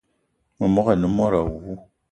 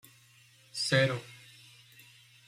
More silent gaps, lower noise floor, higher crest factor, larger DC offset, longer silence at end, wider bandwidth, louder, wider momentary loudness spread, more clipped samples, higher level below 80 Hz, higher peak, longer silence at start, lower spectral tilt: neither; first, -70 dBFS vs -61 dBFS; about the same, 18 dB vs 22 dB; neither; second, 0.3 s vs 1.1 s; second, 9 kHz vs 15.5 kHz; first, -21 LUFS vs -30 LUFS; second, 17 LU vs 26 LU; neither; first, -42 dBFS vs -72 dBFS; first, -4 dBFS vs -12 dBFS; second, 0.6 s vs 0.75 s; first, -9 dB/octave vs -4 dB/octave